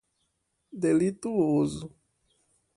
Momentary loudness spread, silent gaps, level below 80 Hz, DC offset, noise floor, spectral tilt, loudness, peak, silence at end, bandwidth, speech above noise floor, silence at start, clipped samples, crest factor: 19 LU; none; -62 dBFS; under 0.1%; -77 dBFS; -7 dB/octave; -27 LUFS; -14 dBFS; 0.9 s; 11.5 kHz; 51 dB; 0.75 s; under 0.1%; 16 dB